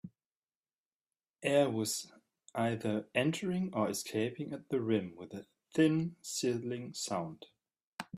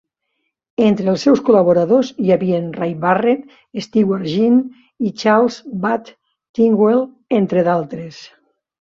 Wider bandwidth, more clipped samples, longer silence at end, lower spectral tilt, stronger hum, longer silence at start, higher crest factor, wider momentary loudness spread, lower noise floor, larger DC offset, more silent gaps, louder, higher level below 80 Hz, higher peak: first, 15.5 kHz vs 7.4 kHz; neither; second, 0 s vs 0.55 s; second, -5 dB/octave vs -7 dB/octave; neither; second, 0.05 s vs 0.8 s; first, 20 dB vs 14 dB; first, 18 LU vs 14 LU; first, under -90 dBFS vs -72 dBFS; neither; first, 0.26-0.30 s, 0.37-0.42 s, 0.56-0.61 s, 0.74-1.00 s, 1.30-1.34 s, 7.84-7.98 s vs 6.49-6.54 s; second, -34 LUFS vs -16 LUFS; second, -76 dBFS vs -60 dBFS; second, -16 dBFS vs -2 dBFS